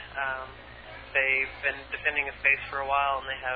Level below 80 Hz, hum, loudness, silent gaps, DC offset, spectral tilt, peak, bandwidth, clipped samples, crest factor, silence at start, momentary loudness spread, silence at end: -52 dBFS; none; -27 LUFS; none; under 0.1%; -6 dB/octave; -10 dBFS; 5 kHz; under 0.1%; 20 dB; 0 s; 18 LU; 0 s